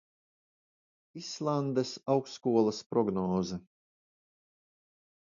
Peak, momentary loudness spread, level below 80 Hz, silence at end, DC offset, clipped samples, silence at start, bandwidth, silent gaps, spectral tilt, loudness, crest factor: -14 dBFS; 14 LU; -66 dBFS; 1.65 s; under 0.1%; under 0.1%; 1.15 s; 7.6 kHz; 2.86-2.90 s; -6.5 dB/octave; -31 LUFS; 20 dB